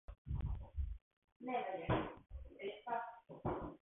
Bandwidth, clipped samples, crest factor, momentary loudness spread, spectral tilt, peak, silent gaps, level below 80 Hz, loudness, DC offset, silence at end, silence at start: 3.9 kHz; under 0.1%; 20 dB; 12 LU; -4.5 dB/octave; -24 dBFS; 0.18-0.25 s, 1.02-1.22 s, 1.32-1.40 s; -50 dBFS; -45 LUFS; under 0.1%; 0.2 s; 0.1 s